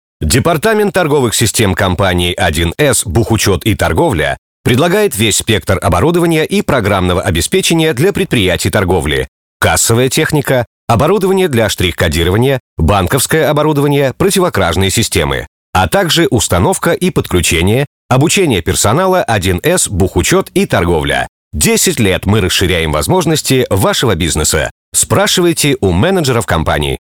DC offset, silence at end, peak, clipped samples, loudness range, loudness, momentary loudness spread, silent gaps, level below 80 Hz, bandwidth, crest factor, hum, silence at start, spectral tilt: 0.6%; 0.1 s; 0 dBFS; under 0.1%; 1 LU; -11 LUFS; 4 LU; 4.38-4.64 s, 9.28-9.60 s, 10.67-10.88 s, 12.60-12.77 s, 15.47-15.73 s, 17.87-18.09 s, 21.29-21.51 s, 24.71-24.92 s; -28 dBFS; 19 kHz; 12 dB; none; 0.2 s; -4 dB/octave